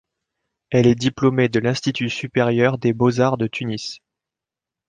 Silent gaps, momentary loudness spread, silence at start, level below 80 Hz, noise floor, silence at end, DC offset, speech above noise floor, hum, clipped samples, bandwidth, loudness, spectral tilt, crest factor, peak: none; 9 LU; 0.7 s; -54 dBFS; -87 dBFS; 0.9 s; under 0.1%; 69 dB; none; under 0.1%; 9.4 kHz; -19 LUFS; -6.5 dB/octave; 18 dB; -4 dBFS